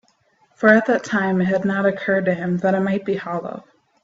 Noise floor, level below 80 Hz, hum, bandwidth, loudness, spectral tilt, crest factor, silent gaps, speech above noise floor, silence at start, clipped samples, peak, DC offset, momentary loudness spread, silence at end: -61 dBFS; -62 dBFS; none; 7.8 kHz; -19 LUFS; -7 dB/octave; 20 dB; none; 42 dB; 0.6 s; under 0.1%; -2 dBFS; under 0.1%; 12 LU; 0.45 s